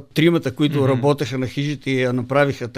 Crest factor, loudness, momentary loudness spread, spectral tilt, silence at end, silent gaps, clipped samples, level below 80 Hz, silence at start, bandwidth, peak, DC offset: 16 dB; -19 LUFS; 6 LU; -6.5 dB/octave; 0 s; none; under 0.1%; -56 dBFS; 0 s; 15.5 kHz; -4 dBFS; under 0.1%